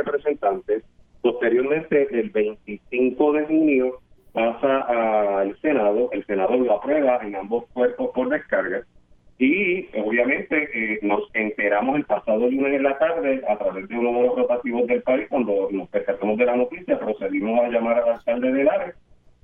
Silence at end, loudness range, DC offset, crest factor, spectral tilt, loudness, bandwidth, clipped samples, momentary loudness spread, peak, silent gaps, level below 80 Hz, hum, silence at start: 0.5 s; 2 LU; under 0.1%; 16 dB; -9 dB/octave; -22 LUFS; 3.7 kHz; under 0.1%; 6 LU; -6 dBFS; none; -56 dBFS; none; 0 s